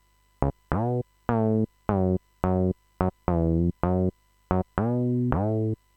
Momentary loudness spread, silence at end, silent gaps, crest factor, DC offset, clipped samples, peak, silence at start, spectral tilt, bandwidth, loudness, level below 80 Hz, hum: 5 LU; 0.2 s; none; 20 dB; under 0.1%; under 0.1%; -4 dBFS; 0.4 s; -11.5 dB/octave; 3.8 kHz; -27 LUFS; -40 dBFS; none